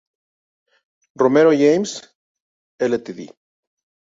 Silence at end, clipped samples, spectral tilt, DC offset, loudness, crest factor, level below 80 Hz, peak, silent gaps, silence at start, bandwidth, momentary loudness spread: 0.85 s; under 0.1%; -5.5 dB/octave; under 0.1%; -17 LUFS; 18 dB; -66 dBFS; -2 dBFS; 2.15-2.79 s; 1.2 s; 7.8 kHz; 21 LU